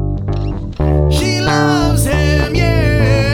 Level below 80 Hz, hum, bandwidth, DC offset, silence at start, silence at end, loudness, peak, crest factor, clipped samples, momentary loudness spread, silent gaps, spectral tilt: -20 dBFS; none; 18 kHz; under 0.1%; 0 s; 0 s; -14 LUFS; 0 dBFS; 12 dB; under 0.1%; 7 LU; none; -6 dB/octave